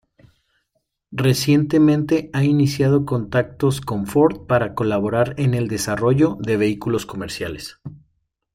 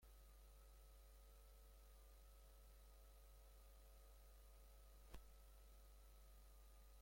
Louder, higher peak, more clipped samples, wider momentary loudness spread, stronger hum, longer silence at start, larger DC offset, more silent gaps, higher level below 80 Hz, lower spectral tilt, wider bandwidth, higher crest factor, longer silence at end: first, -19 LUFS vs -68 LUFS; first, -4 dBFS vs -40 dBFS; neither; first, 12 LU vs 2 LU; neither; first, 1.1 s vs 0 s; neither; neither; first, -50 dBFS vs -66 dBFS; first, -6.5 dB/octave vs -4 dB/octave; about the same, 16 kHz vs 16.5 kHz; second, 16 dB vs 24 dB; first, 0.55 s vs 0 s